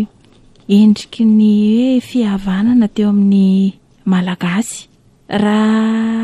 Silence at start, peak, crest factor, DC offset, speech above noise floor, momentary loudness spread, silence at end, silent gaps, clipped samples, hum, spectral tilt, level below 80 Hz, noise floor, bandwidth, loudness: 0 s; -2 dBFS; 12 dB; under 0.1%; 34 dB; 9 LU; 0 s; none; under 0.1%; none; -6.5 dB/octave; -46 dBFS; -46 dBFS; 11.5 kHz; -13 LUFS